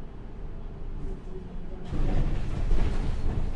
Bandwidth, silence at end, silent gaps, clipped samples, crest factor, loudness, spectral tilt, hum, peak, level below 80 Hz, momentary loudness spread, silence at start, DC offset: 5.8 kHz; 0 s; none; under 0.1%; 14 dB; -35 LUFS; -7.5 dB/octave; none; -12 dBFS; -28 dBFS; 12 LU; 0 s; under 0.1%